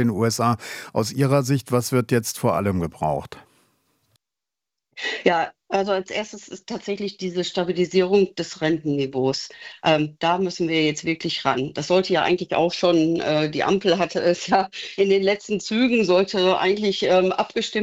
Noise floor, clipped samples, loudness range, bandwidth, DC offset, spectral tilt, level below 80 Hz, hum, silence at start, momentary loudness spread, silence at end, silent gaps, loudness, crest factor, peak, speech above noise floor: -88 dBFS; under 0.1%; 6 LU; 16 kHz; under 0.1%; -5 dB/octave; -58 dBFS; none; 0 s; 9 LU; 0 s; none; -22 LUFS; 18 dB; -4 dBFS; 67 dB